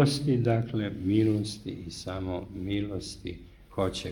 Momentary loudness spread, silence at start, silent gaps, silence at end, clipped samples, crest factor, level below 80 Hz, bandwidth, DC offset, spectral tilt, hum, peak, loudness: 14 LU; 0 s; none; 0 s; under 0.1%; 20 dB; -52 dBFS; 17.5 kHz; under 0.1%; -6.5 dB/octave; none; -10 dBFS; -30 LUFS